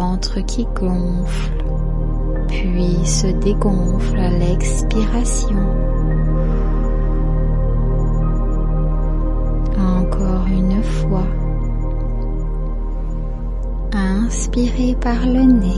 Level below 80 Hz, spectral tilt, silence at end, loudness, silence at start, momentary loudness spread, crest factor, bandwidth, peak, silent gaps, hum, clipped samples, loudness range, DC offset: -18 dBFS; -6.5 dB/octave; 0 s; -20 LUFS; 0 s; 6 LU; 14 dB; 11 kHz; -2 dBFS; none; none; under 0.1%; 3 LU; under 0.1%